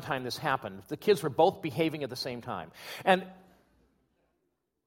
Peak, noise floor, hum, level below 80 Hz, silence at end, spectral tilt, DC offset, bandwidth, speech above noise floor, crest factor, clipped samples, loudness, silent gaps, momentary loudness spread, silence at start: -6 dBFS; -80 dBFS; none; -68 dBFS; 1.5 s; -5 dB/octave; under 0.1%; 16.5 kHz; 49 dB; 26 dB; under 0.1%; -30 LUFS; none; 13 LU; 0 s